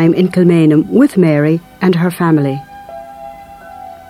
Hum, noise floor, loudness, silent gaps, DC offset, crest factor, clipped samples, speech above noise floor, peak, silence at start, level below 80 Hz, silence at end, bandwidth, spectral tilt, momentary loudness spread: none; -33 dBFS; -12 LUFS; none; under 0.1%; 12 dB; under 0.1%; 22 dB; 0 dBFS; 0 s; -50 dBFS; 0.15 s; 15 kHz; -8 dB/octave; 22 LU